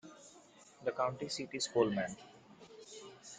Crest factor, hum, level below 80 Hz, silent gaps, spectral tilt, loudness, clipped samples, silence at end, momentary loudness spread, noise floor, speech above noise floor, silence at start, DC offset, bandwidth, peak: 22 dB; none; -74 dBFS; none; -4 dB/octave; -37 LUFS; under 0.1%; 0 s; 25 LU; -61 dBFS; 25 dB; 0.05 s; under 0.1%; 9.6 kHz; -16 dBFS